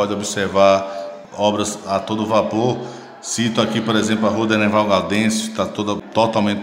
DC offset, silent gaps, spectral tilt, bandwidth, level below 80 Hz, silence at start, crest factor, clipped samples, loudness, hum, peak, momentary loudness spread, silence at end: under 0.1%; none; -4.5 dB/octave; 16 kHz; -58 dBFS; 0 s; 18 dB; under 0.1%; -18 LUFS; none; 0 dBFS; 10 LU; 0 s